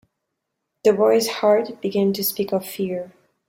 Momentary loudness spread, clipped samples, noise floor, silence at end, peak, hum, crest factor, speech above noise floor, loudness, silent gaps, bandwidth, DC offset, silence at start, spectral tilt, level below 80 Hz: 9 LU; under 0.1%; -79 dBFS; 0.4 s; -4 dBFS; none; 18 dB; 59 dB; -20 LUFS; none; 16.5 kHz; under 0.1%; 0.85 s; -4.5 dB/octave; -66 dBFS